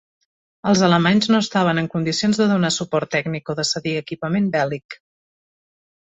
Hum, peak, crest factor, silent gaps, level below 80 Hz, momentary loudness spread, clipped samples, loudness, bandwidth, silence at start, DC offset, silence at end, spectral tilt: none; -2 dBFS; 18 dB; 4.85-4.89 s; -58 dBFS; 10 LU; under 0.1%; -19 LUFS; 8.2 kHz; 0.65 s; under 0.1%; 1.1 s; -5 dB/octave